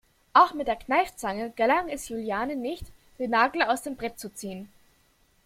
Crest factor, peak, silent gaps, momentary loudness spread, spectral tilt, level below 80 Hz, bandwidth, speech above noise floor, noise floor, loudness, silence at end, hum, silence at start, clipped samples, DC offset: 22 dB; -4 dBFS; none; 16 LU; -3.5 dB/octave; -54 dBFS; 16.5 kHz; 38 dB; -64 dBFS; -26 LUFS; 0.8 s; none; 0.35 s; under 0.1%; under 0.1%